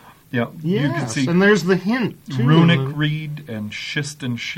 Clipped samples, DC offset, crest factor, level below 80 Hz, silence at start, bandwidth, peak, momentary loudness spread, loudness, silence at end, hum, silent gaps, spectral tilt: under 0.1%; under 0.1%; 16 dB; -56 dBFS; 0.05 s; 15.5 kHz; -4 dBFS; 13 LU; -19 LUFS; 0 s; none; none; -6 dB/octave